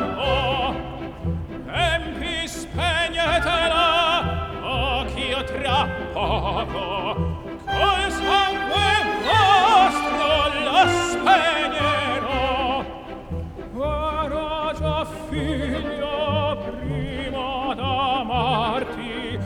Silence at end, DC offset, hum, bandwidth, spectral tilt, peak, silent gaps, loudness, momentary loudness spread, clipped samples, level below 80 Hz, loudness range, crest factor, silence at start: 0 s; under 0.1%; none; 17.5 kHz; -4.5 dB/octave; -4 dBFS; none; -21 LUFS; 11 LU; under 0.1%; -36 dBFS; 8 LU; 18 dB; 0 s